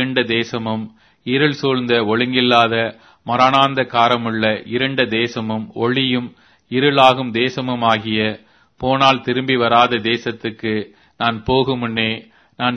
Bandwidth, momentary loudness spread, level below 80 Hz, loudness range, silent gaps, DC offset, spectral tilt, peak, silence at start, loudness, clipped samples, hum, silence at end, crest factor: 7.8 kHz; 11 LU; -52 dBFS; 2 LU; none; under 0.1%; -6 dB/octave; 0 dBFS; 0 s; -17 LUFS; under 0.1%; none; 0 s; 18 dB